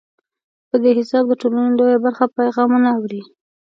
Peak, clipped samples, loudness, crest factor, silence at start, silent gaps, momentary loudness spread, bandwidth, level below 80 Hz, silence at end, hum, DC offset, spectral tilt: -2 dBFS; under 0.1%; -16 LUFS; 16 dB; 0.75 s; none; 7 LU; 6 kHz; -72 dBFS; 0.45 s; none; under 0.1%; -7 dB/octave